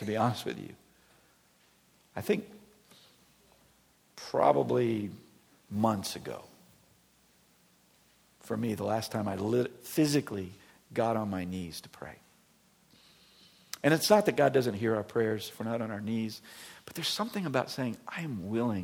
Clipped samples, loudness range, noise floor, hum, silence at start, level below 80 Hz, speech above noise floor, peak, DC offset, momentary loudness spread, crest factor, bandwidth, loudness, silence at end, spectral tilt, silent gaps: under 0.1%; 9 LU; -66 dBFS; none; 0 s; -70 dBFS; 35 dB; -8 dBFS; under 0.1%; 19 LU; 24 dB; 19 kHz; -31 LUFS; 0 s; -5.5 dB/octave; none